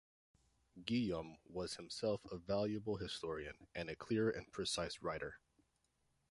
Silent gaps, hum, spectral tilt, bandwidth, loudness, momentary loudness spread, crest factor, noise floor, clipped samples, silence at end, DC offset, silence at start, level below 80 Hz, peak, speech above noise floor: none; none; -5 dB/octave; 11.5 kHz; -43 LUFS; 10 LU; 20 dB; -81 dBFS; under 0.1%; 0.95 s; under 0.1%; 0.75 s; -66 dBFS; -24 dBFS; 39 dB